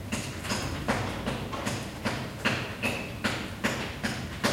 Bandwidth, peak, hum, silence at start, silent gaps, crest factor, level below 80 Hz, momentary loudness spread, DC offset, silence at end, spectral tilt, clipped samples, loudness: 16.5 kHz; -12 dBFS; none; 0 s; none; 20 dB; -48 dBFS; 4 LU; under 0.1%; 0 s; -4 dB/octave; under 0.1%; -31 LUFS